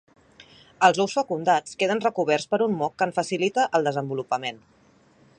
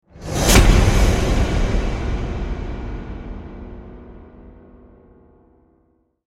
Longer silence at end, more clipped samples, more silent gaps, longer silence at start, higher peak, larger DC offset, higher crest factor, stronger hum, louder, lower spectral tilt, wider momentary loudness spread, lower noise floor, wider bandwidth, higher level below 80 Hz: second, 0.85 s vs 1.8 s; neither; neither; first, 0.4 s vs 0.15 s; about the same, -2 dBFS vs 0 dBFS; neither; about the same, 22 dB vs 20 dB; neither; second, -24 LUFS vs -19 LUFS; about the same, -4.5 dB/octave vs -4.5 dB/octave; second, 7 LU vs 24 LU; second, -57 dBFS vs -62 dBFS; second, 10.5 kHz vs 16.5 kHz; second, -70 dBFS vs -22 dBFS